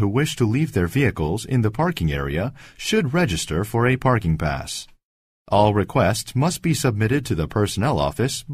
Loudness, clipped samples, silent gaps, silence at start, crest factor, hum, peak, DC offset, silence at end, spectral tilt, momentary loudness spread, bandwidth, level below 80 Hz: -21 LUFS; under 0.1%; 5.03-5.45 s; 0 s; 18 dB; none; -4 dBFS; under 0.1%; 0 s; -5.5 dB/octave; 6 LU; 15.5 kHz; -40 dBFS